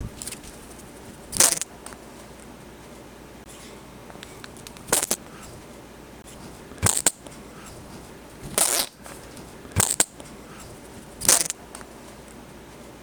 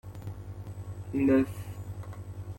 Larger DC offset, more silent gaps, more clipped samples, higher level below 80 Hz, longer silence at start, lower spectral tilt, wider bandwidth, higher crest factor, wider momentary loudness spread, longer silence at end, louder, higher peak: neither; neither; neither; about the same, -50 dBFS vs -52 dBFS; about the same, 0 s vs 0.05 s; second, -1.5 dB/octave vs -8.5 dB/octave; first, over 20 kHz vs 16.5 kHz; first, 30 dB vs 18 dB; first, 25 LU vs 17 LU; about the same, 0 s vs 0 s; first, -22 LUFS vs -31 LUFS; first, 0 dBFS vs -14 dBFS